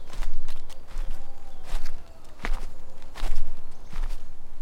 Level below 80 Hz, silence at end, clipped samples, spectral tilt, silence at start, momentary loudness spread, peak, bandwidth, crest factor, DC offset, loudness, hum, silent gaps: -28 dBFS; 0 s; under 0.1%; -4.5 dB/octave; 0 s; 11 LU; -6 dBFS; 5.2 kHz; 12 dB; under 0.1%; -40 LUFS; none; none